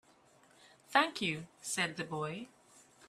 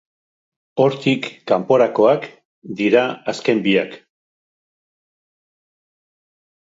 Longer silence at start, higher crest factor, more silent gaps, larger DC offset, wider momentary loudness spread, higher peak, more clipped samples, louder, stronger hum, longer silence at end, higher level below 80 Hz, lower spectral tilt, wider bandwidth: first, 0.9 s vs 0.75 s; first, 26 dB vs 20 dB; second, none vs 2.45-2.62 s; neither; about the same, 12 LU vs 12 LU; second, -12 dBFS vs 0 dBFS; neither; second, -35 LUFS vs -18 LUFS; neither; second, 0.05 s vs 2.7 s; second, -78 dBFS vs -70 dBFS; second, -3 dB/octave vs -6 dB/octave; first, 15 kHz vs 7.8 kHz